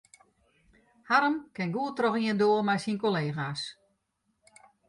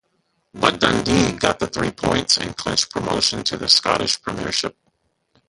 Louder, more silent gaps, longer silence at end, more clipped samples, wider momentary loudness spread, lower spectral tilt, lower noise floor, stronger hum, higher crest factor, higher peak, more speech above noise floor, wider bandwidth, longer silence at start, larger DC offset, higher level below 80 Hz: second, -28 LUFS vs -19 LUFS; neither; first, 1.15 s vs 0.8 s; neither; about the same, 9 LU vs 8 LU; first, -6 dB/octave vs -3 dB/octave; first, -77 dBFS vs -68 dBFS; neither; about the same, 20 dB vs 22 dB; second, -10 dBFS vs 0 dBFS; about the same, 49 dB vs 48 dB; about the same, 11.5 kHz vs 11.5 kHz; first, 1.1 s vs 0.55 s; neither; second, -72 dBFS vs -44 dBFS